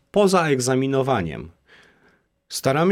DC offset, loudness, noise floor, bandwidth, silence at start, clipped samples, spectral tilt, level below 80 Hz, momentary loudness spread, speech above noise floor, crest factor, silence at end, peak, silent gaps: under 0.1%; -21 LUFS; -61 dBFS; 16.5 kHz; 0.15 s; under 0.1%; -5 dB/octave; -52 dBFS; 15 LU; 42 dB; 16 dB; 0 s; -4 dBFS; none